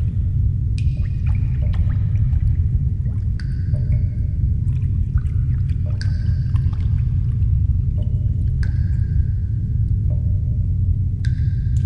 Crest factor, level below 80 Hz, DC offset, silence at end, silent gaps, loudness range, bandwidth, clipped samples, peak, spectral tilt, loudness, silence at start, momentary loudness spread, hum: 12 dB; -22 dBFS; under 0.1%; 0 s; none; 1 LU; 5.6 kHz; under 0.1%; -6 dBFS; -9.5 dB/octave; -21 LUFS; 0 s; 2 LU; none